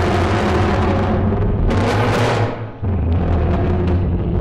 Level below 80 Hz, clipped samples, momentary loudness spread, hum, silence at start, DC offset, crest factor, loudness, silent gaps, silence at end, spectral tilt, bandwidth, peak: -24 dBFS; under 0.1%; 4 LU; none; 0 s; under 0.1%; 10 dB; -18 LUFS; none; 0 s; -7.5 dB/octave; 10.5 kHz; -6 dBFS